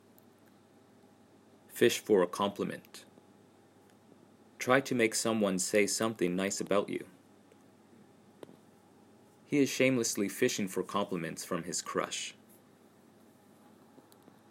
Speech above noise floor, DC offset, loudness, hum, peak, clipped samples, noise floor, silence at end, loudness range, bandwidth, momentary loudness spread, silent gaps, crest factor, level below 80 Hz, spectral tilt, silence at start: 30 dB; under 0.1%; -31 LUFS; none; -10 dBFS; under 0.1%; -61 dBFS; 2.2 s; 7 LU; 16 kHz; 11 LU; none; 26 dB; -80 dBFS; -3.5 dB/octave; 1.7 s